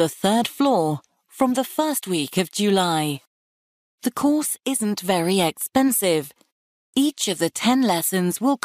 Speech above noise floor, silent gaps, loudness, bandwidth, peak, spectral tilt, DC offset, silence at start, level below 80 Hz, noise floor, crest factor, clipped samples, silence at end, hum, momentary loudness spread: over 69 dB; 3.27-3.98 s, 6.52-6.93 s; -21 LUFS; 15.5 kHz; -8 dBFS; -4 dB/octave; under 0.1%; 0 s; -64 dBFS; under -90 dBFS; 14 dB; under 0.1%; 0.1 s; none; 7 LU